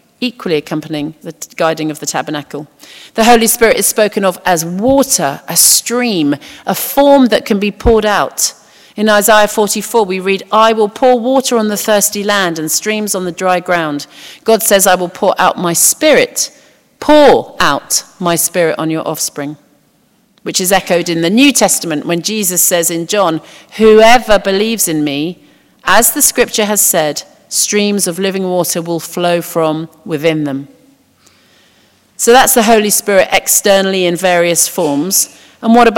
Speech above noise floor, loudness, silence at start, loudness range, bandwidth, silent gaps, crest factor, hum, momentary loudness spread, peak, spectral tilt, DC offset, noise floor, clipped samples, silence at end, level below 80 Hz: 42 dB; -11 LUFS; 0.2 s; 5 LU; over 20 kHz; none; 12 dB; none; 12 LU; 0 dBFS; -3 dB/octave; under 0.1%; -53 dBFS; 0.8%; 0 s; -38 dBFS